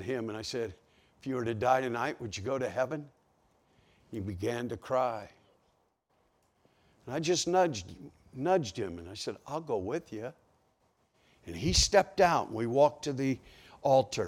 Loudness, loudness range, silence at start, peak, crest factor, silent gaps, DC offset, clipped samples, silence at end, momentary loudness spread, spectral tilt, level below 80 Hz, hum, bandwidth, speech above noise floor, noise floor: -31 LUFS; 9 LU; 0 s; -12 dBFS; 22 dB; none; under 0.1%; under 0.1%; 0 s; 15 LU; -4 dB/octave; -52 dBFS; none; 16 kHz; 43 dB; -73 dBFS